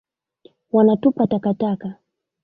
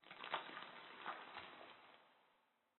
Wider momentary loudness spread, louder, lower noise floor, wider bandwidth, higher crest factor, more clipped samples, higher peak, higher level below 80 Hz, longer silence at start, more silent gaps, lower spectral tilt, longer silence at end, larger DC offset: second, 11 LU vs 16 LU; first, -19 LUFS vs -52 LUFS; second, -54 dBFS vs -80 dBFS; first, 4.7 kHz vs 4.2 kHz; second, 16 dB vs 30 dB; neither; first, -4 dBFS vs -26 dBFS; first, -60 dBFS vs under -90 dBFS; first, 0.75 s vs 0 s; neither; first, -12 dB/octave vs 0.5 dB/octave; about the same, 0.5 s vs 0.4 s; neither